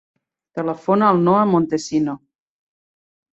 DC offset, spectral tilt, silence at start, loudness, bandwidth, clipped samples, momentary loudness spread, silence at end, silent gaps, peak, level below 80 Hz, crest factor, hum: under 0.1%; -7 dB/octave; 0.55 s; -18 LUFS; 8.2 kHz; under 0.1%; 12 LU; 1.15 s; none; -2 dBFS; -60 dBFS; 18 dB; none